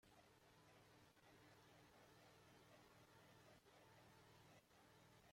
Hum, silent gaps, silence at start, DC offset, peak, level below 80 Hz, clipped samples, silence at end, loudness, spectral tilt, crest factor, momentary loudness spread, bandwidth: none; none; 0 s; under 0.1%; -58 dBFS; -88 dBFS; under 0.1%; 0 s; -70 LUFS; -4 dB/octave; 12 dB; 0 LU; 16 kHz